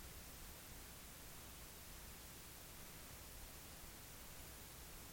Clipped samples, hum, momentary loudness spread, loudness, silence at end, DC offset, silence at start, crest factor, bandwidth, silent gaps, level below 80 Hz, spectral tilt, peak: under 0.1%; none; 0 LU; -55 LUFS; 0 s; under 0.1%; 0 s; 14 dB; 17 kHz; none; -62 dBFS; -2.5 dB/octave; -42 dBFS